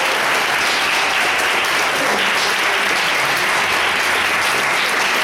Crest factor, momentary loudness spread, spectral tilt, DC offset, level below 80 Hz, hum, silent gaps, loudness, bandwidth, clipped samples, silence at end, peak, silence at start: 12 dB; 0 LU; -0.5 dB/octave; under 0.1%; -54 dBFS; none; none; -15 LUFS; 16.5 kHz; under 0.1%; 0 s; -4 dBFS; 0 s